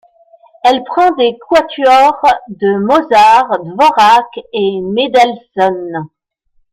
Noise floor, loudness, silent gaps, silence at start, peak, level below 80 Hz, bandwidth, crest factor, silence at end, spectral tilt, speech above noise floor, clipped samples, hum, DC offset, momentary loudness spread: -57 dBFS; -11 LUFS; none; 0.65 s; 0 dBFS; -50 dBFS; 15.5 kHz; 12 dB; 0.65 s; -4.5 dB/octave; 47 dB; under 0.1%; none; under 0.1%; 9 LU